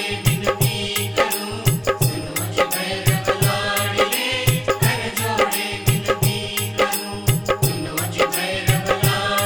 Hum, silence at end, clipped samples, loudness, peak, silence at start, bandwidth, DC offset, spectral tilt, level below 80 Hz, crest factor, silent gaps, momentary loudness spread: none; 0 s; under 0.1%; -20 LUFS; -2 dBFS; 0 s; over 20 kHz; under 0.1%; -4 dB/octave; -40 dBFS; 18 dB; none; 3 LU